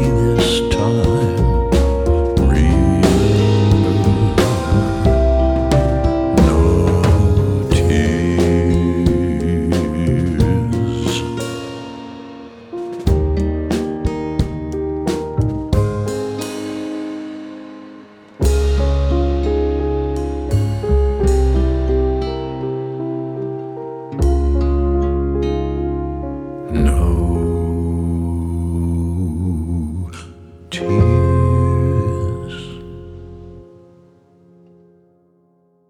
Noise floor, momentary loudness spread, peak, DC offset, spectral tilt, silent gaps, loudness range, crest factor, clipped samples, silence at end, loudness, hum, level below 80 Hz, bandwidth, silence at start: -57 dBFS; 14 LU; -2 dBFS; under 0.1%; -7.5 dB/octave; none; 7 LU; 14 dB; under 0.1%; 2.25 s; -17 LUFS; none; -22 dBFS; 13.5 kHz; 0 s